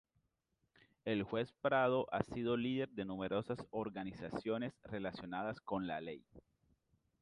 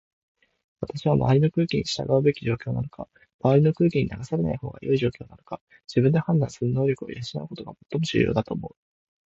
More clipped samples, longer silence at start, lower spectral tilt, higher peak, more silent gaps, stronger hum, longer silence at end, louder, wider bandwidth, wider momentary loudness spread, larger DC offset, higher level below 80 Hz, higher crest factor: neither; first, 1.05 s vs 0.8 s; about the same, -7.5 dB/octave vs -7.5 dB/octave; second, -18 dBFS vs -8 dBFS; second, none vs 3.34-3.39 s, 5.61-5.67 s; neither; first, 0.8 s vs 0.6 s; second, -40 LUFS vs -24 LUFS; first, 11 kHz vs 8 kHz; second, 10 LU vs 18 LU; neither; second, -68 dBFS vs -50 dBFS; first, 24 dB vs 18 dB